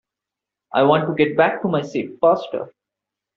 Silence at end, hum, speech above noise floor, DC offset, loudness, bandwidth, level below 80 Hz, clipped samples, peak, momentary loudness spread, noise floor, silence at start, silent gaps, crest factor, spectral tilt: 0.65 s; none; 68 dB; under 0.1%; -19 LUFS; 7.2 kHz; -64 dBFS; under 0.1%; -2 dBFS; 12 LU; -86 dBFS; 0.75 s; none; 20 dB; -4.5 dB/octave